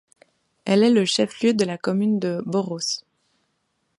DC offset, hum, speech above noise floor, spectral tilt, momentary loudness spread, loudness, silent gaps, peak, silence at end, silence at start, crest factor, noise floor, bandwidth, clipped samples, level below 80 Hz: under 0.1%; none; 51 dB; -5 dB/octave; 9 LU; -21 LUFS; none; -6 dBFS; 1 s; 0.65 s; 18 dB; -72 dBFS; 11.5 kHz; under 0.1%; -70 dBFS